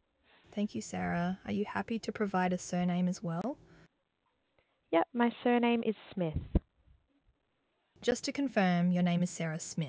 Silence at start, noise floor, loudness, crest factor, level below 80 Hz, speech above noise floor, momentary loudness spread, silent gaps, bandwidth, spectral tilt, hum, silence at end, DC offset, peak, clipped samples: 0.55 s; -79 dBFS; -33 LUFS; 18 dB; -50 dBFS; 47 dB; 8 LU; none; 8 kHz; -6 dB/octave; none; 0 s; under 0.1%; -16 dBFS; under 0.1%